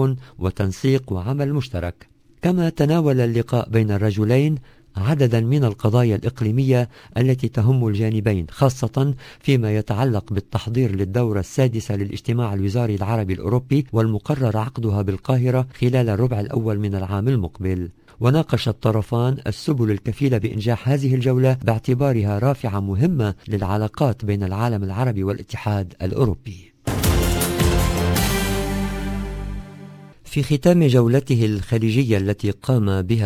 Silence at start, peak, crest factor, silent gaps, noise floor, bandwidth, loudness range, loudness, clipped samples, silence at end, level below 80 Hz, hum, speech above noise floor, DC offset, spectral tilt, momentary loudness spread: 0 s; -2 dBFS; 18 dB; none; -40 dBFS; 16 kHz; 3 LU; -21 LUFS; under 0.1%; 0 s; -34 dBFS; none; 21 dB; under 0.1%; -7 dB/octave; 7 LU